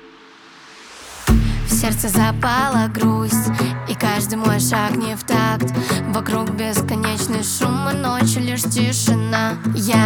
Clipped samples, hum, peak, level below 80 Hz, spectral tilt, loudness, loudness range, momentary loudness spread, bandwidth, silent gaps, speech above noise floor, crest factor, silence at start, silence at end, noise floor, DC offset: under 0.1%; none; 0 dBFS; -32 dBFS; -4.5 dB/octave; -18 LUFS; 2 LU; 4 LU; over 20 kHz; none; 26 dB; 18 dB; 0.05 s; 0 s; -44 dBFS; under 0.1%